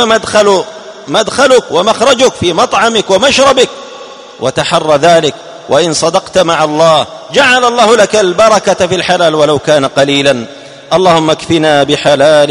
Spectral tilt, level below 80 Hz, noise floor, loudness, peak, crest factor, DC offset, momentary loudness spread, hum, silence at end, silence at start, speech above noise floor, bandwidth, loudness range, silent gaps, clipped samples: -3.5 dB/octave; -44 dBFS; -29 dBFS; -8 LUFS; 0 dBFS; 8 dB; 0.2%; 7 LU; none; 0 s; 0 s; 21 dB; 13 kHz; 2 LU; none; 1%